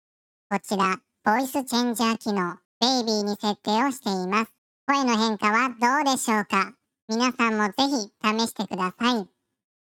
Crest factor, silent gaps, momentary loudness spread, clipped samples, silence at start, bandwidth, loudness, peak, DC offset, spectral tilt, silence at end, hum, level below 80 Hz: 20 dB; 2.65-2.81 s, 4.58-4.87 s, 7.02-7.08 s; 7 LU; under 0.1%; 0.5 s; 17.5 kHz; -24 LUFS; -4 dBFS; under 0.1%; -3.5 dB/octave; 0.75 s; none; -70 dBFS